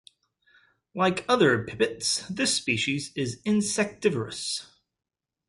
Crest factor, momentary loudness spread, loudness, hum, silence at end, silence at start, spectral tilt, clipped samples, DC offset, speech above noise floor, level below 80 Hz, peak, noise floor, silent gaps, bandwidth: 20 dB; 9 LU; -26 LUFS; none; 0.85 s; 0.95 s; -3.5 dB/octave; under 0.1%; under 0.1%; 38 dB; -62 dBFS; -8 dBFS; -64 dBFS; none; 11.5 kHz